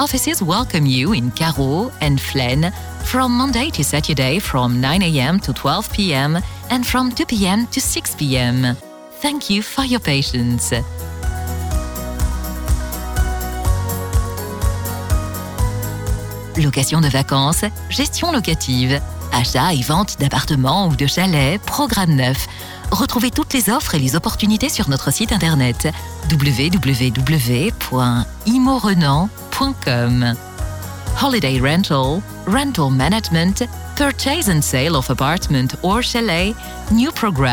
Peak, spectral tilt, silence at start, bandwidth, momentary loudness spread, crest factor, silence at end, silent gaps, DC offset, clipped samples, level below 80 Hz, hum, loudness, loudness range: -4 dBFS; -4.5 dB/octave; 0 s; over 20 kHz; 7 LU; 12 dB; 0 s; none; under 0.1%; under 0.1%; -28 dBFS; none; -17 LUFS; 5 LU